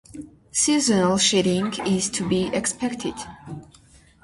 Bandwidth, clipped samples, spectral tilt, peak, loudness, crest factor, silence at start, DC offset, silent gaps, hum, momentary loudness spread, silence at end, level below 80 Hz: 11.5 kHz; under 0.1%; -3.5 dB/octave; -8 dBFS; -21 LUFS; 16 dB; 0.1 s; under 0.1%; none; none; 21 LU; 0.6 s; -52 dBFS